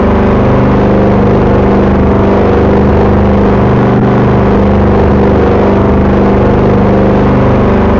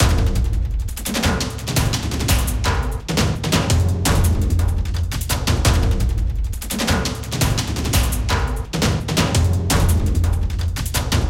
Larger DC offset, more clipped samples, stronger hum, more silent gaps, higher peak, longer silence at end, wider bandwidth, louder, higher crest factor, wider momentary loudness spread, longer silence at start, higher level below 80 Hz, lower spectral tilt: neither; neither; first, 50 Hz at -15 dBFS vs none; neither; about the same, -2 dBFS vs -2 dBFS; about the same, 0 s vs 0 s; second, 6.8 kHz vs 17 kHz; first, -7 LUFS vs -20 LUFS; second, 4 dB vs 16 dB; second, 0 LU vs 6 LU; about the same, 0 s vs 0 s; first, -16 dBFS vs -22 dBFS; first, -9.5 dB/octave vs -4.5 dB/octave